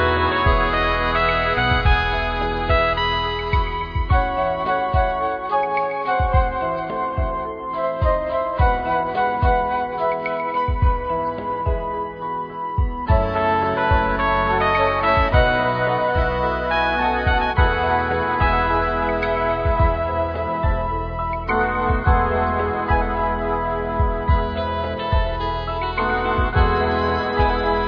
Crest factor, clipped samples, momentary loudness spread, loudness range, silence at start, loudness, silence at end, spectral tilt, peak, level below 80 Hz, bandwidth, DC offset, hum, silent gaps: 16 dB; under 0.1%; 6 LU; 3 LU; 0 s; -20 LUFS; 0 s; -8 dB/octave; -4 dBFS; -26 dBFS; 5.2 kHz; under 0.1%; none; none